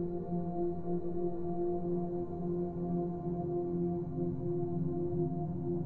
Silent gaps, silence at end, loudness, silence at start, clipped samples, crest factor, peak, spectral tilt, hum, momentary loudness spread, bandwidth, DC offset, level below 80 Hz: none; 0 s; -36 LUFS; 0 s; under 0.1%; 12 dB; -24 dBFS; -13.5 dB/octave; none; 2 LU; 1.9 kHz; 0.5%; -56 dBFS